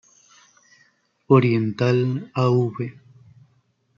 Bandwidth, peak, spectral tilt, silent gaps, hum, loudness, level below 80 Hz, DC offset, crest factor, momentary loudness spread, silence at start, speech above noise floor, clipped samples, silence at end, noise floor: 7.2 kHz; -2 dBFS; -8.5 dB/octave; none; none; -21 LUFS; -66 dBFS; under 0.1%; 20 dB; 11 LU; 1.3 s; 45 dB; under 0.1%; 1.05 s; -64 dBFS